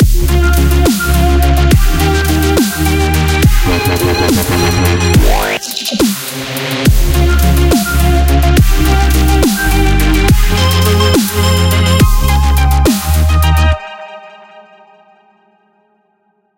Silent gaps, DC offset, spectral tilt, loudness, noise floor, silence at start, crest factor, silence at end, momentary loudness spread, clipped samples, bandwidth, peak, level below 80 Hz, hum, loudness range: none; under 0.1%; -5 dB/octave; -11 LUFS; -58 dBFS; 0 s; 10 dB; 1.95 s; 3 LU; under 0.1%; 17.5 kHz; 0 dBFS; -12 dBFS; none; 3 LU